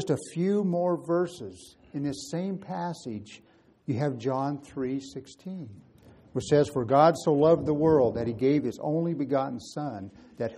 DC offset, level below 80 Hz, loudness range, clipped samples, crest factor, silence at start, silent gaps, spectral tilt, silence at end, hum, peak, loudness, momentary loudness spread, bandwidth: under 0.1%; -60 dBFS; 10 LU; under 0.1%; 20 dB; 0 s; none; -7 dB/octave; 0 s; none; -8 dBFS; -27 LUFS; 19 LU; 12.5 kHz